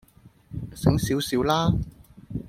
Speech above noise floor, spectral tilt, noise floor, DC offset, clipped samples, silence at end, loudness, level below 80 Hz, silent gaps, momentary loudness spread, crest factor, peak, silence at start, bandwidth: 30 dB; -6 dB/octave; -52 dBFS; under 0.1%; under 0.1%; 0 s; -24 LUFS; -40 dBFS; none; 16 LU; 22 dB; -4 dBFS; 0.25 s; 16.5 kHz